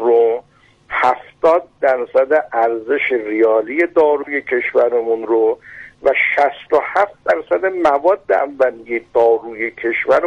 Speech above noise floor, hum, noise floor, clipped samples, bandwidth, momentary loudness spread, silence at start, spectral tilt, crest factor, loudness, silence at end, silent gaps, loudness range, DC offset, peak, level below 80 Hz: 35 dB; none; -50 dBFS; under 0.1%; 7.4 kHz; 5 LU; 0 s; -5.5 dB/octave; 12 dB; -16 LUFS; 0 s; none; 1 LU; under 0.1%; -4 dBFS; -56 dBFS